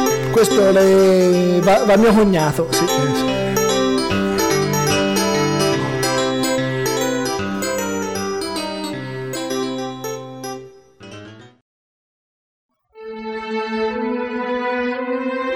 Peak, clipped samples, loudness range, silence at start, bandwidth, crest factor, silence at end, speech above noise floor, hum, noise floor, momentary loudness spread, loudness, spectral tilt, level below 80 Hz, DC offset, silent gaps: -4 dBFS; under 0.1%; 16 LU; 0 s; 16.5 kHz; 14 dB; 0 s; 27 dB; none; -40 dBFS; 15 LU; -18 LUFS; -4.5 dB/octave; -46 dBFS; under 0.1%; 11.62-12.69 s